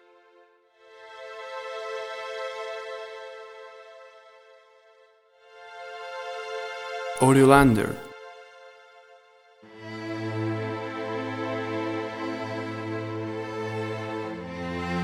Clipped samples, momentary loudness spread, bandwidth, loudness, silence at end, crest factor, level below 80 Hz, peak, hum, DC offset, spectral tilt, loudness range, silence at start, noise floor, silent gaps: under 0.1%; 24 LU; 16.5 kHz; -27 LUFS; 0 s; 26 dB; -50 dBFS; -2 dBFS; none; under 0.1%; -6 dB/octave; 17 LU; 0.85 s; -59 dBFS; none